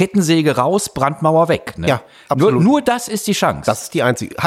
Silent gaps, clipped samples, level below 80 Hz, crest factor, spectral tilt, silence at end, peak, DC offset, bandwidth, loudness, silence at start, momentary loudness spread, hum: none; under 0.1%; -46 dBFS; 14 dB; -5.5 dB/octave; 0 s; -2 dBFS; under 0.1%; 16 kHz; -16 LUFS; 0 s; 6 LU; none